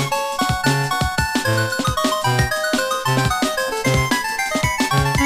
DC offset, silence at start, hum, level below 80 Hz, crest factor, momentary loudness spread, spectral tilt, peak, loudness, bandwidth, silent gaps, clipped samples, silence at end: under 0.1%; 0 s; none; -34 dBFS; 16 dB; 2 LU; -4 dB/octave; -4 dBFS; -19 LUFS; 16 kHz; none; under 0.1%; 0 s